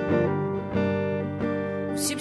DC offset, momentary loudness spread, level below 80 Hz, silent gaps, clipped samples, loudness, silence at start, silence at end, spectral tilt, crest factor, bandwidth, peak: under 0.1%; 4 LU; -54 dBFS; none; under 0.1%; -27 LUFS; 0 s; 0 s; -5.5 dB/octave; 14 dB; 12 kHz; -12 dBFS